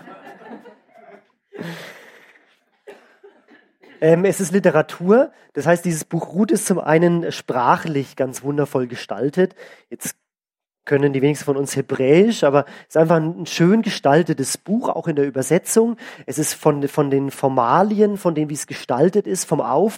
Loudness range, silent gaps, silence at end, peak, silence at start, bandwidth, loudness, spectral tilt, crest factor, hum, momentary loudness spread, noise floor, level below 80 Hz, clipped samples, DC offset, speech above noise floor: 5 LU; none; 0 s; -2 dBFS; 0.05 s; 16.5 kHz; -19 LUFS; -5.5 dB/octave; 18 dB; none; 12 LU; under -90 dBFS; -66 dBFS; under 0.1%; under 0.1%; over 72 dB